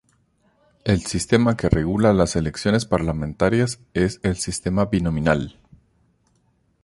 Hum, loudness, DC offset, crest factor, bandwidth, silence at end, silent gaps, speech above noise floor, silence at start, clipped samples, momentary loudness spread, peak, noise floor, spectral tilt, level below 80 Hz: none; -21 LUFS; under 0.1%; 20 dB; 11.5 kHz; 1.35 s; none; 44 dB; 0.85 s; under 0.1%; 6 LU; -2 dBFS; -64 dBFS; -6 dB/octave; -38 dBFS